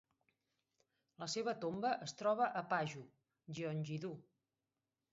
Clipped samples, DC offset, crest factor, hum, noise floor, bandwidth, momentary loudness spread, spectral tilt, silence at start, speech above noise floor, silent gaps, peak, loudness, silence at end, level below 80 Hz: under 0.1%; under 0.1%; 20 dB; none; under -90 dBFS; 7.6 kHz; 13 LU; -4 dB/octave; 1.2 s; over 50 dB; none; -24 dBFS; -41 LUFS; 0.9 s; -84 dBFS